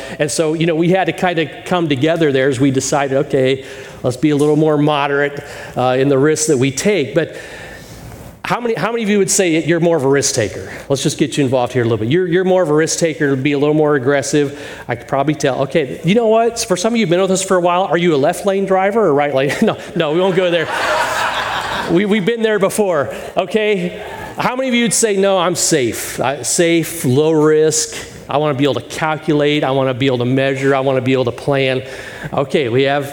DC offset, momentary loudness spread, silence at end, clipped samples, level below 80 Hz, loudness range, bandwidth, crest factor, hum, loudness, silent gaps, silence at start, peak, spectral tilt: under 0.1%; 8 LU; 0 s; under 0.1%; -48 dBFS; 2 LU; 17.5 kHz; 14 dB; none; -15 LUFS; none; 0 s; 0 dBFS; -4.5 dB/octave